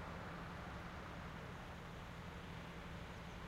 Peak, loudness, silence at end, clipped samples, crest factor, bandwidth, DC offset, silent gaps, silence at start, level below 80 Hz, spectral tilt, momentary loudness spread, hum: -38 dBFS; -51 LUFS; 0 s; under 0.1%; 12 dB; 16 kHz; under 0.1%; none; 0 s; -58 dBFS; -5.5 dB/octave; 2 LU; none